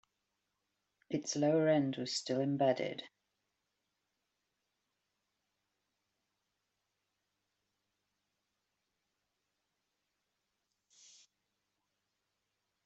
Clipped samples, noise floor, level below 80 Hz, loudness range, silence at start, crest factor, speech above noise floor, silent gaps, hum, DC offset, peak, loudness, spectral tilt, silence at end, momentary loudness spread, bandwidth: under 0.1%; -86 dBFS; -86 dBFS; 7 LU; 1.1 s; 22 dB; 53 dB; none; none; under 0.1%; -20 dBFS; -34 LUFS; -5 dB/octave; 9.8 s; 11 LU; 8 kHz